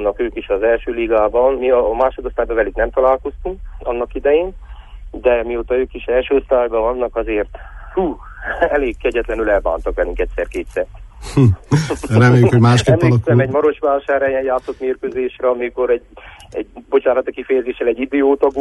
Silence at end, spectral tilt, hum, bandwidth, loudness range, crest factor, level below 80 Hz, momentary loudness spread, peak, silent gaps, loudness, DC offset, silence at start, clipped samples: 0 s; -7.5 dB/octave; none; 11.5 kHz; 6 LU; 14 dB; -34 dBFS; 11 LU; -2 dBFS; none; -17 LUFS; under 0.1%; 0 s; under 0.1%